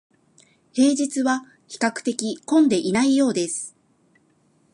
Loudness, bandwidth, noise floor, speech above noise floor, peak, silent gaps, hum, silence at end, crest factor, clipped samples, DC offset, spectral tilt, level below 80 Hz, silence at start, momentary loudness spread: -21 LUFS; 11.5 kHz; -62 dBFS; 41 dB; -4 dBFS; none; none; 1.05 s; 20 dB; under 0.1%; under 0.1%; -4 dB/octave; -66 dBFS; 0.75 s; 11 LU